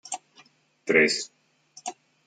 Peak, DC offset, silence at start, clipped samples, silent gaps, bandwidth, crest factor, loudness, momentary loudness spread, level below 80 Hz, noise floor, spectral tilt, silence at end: -6 dBFS; under 0.1%; 0.05 s; under 0.1%; none; 9.6 kHz; 22 dB; -22 LUFS; 19 LU; -82 dBFS; -59 dBFS; -2.5 dB/octave; 0.35 s